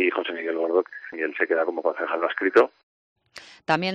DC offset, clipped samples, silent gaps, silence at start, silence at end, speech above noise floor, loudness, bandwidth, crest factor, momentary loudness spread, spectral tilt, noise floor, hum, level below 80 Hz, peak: under 0.1%; under 0.1%; 2.83-3.16 s; 0 s; 0 s; 25 dB; -24 LUFS; 8.8 kHz; 20 dB; 10 LU; -6 dB/octave; -48 dBFS; none; -74 dBFS; -6 dBFS